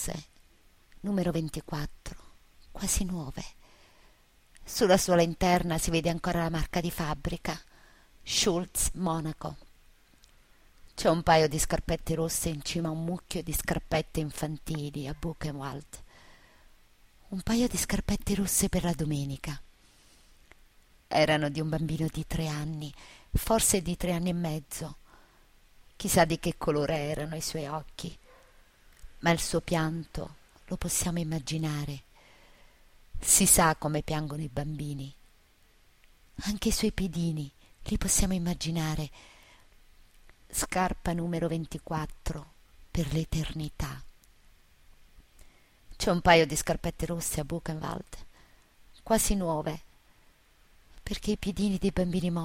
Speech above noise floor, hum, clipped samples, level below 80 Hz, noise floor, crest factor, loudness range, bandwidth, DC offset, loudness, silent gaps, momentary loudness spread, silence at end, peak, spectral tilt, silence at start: 32 dB; none; under 0.1%; -44 dBFS; -62 dBFS; 24 dB; 8 LU; 16 kHz; under 0.1%; -29 LUFS; none; 16 LU; 0 s; -6 dBFS; -4 dB/octave; 0 s